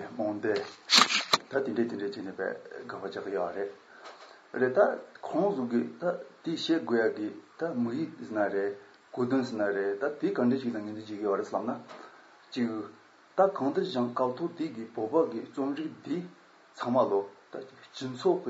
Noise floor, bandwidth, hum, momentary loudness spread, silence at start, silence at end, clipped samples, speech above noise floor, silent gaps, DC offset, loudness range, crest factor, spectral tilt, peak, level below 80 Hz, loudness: -53 dBFS; 13 kHz; none; 15 LU; 0 s; 0 s; under 0.1%; 22 dB; none; under 0.1%; 5 LU; 24 dB; -4 dB/octave; -8 dBFS; -82 dBFS; -30 LUFS